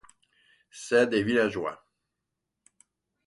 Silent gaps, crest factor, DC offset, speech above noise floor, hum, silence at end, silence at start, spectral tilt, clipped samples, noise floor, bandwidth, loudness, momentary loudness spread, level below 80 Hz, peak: none; 20 dB; under 0.1%; 59 dB; none; 1.5 s; 0.75 s; -5 dB/octave; under 0.1%; -84 dBFS; 11.5 kHz; -26 LUFS; 13 LU; -66 dBFS; -10 dBFS